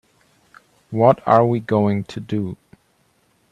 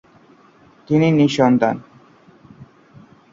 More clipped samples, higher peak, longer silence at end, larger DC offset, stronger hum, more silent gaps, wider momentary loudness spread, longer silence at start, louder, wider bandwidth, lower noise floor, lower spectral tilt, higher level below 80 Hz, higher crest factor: neither; about the same, 0 dBFS vs -2 dBFS; first, 1 s vs 0.7 s; neither; neither; neither; first, 14 LU vs 7 LU; about the same, 0.9 s vs 0.9 s; second, -19 LUFS vs -16 LUFS; first, 10 kHz vs 7.6 kHz; first, -62 dBFS vs -50 dBFS; first, -9 dB/octave vs -7 dB/octave; about the same, -60 dBFS vs -58 dBFS; about the same, 20 dB vs 18 dB